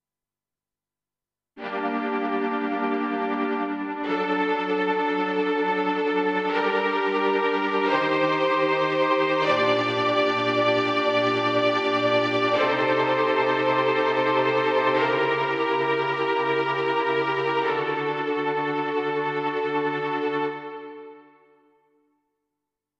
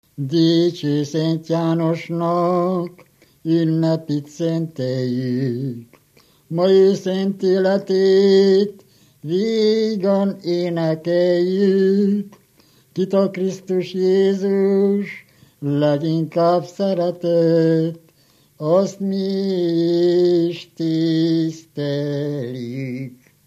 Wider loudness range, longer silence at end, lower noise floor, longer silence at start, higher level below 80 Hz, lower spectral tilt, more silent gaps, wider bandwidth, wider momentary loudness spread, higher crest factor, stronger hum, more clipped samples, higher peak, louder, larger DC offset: about the same, 6 LU vs 4 LU; first, 1.8 s vs 0.35 s; first, under -90 dBFS vs -56 dBFS; first, 1.55 s vs 0.2 s; about the same, -76 dBFS vs -72 dBFS; second, -5.5 dB/octave vs -7.5 dB/octave; neither; second, 8.4 kHz vs 12 kHz; second, 5 LU vs 11 LU; about the same, 16 dB vs 14 dB; neither; neither; second, -8 dBFS vs -4 dBFS; second, -23 LUFS vs -19 LUFS; neither